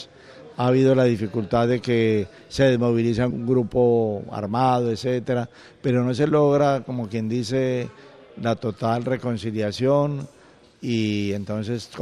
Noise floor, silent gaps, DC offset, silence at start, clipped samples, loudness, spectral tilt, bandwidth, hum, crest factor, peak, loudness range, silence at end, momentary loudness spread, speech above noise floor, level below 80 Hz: -45 dBFS; none; under 0.1%; 0 s; under 0.1%; -22 LUFS; -7.5 dB/octave; 11.5 kHz; none; 16 dB; -6 dBFS; 4 LU; 0 s; 11 LU; 24 dB; -52 dBFS